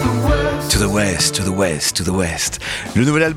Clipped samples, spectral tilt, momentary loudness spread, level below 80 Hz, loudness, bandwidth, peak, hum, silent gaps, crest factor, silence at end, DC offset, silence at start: under 0.1%; -4 dB/octave; 5 LU; -28 dBFS; -17 LUFS; 17 kHz; -2 dBFS; none; none; 16 dB; 0 s; under 0.1%; 0 s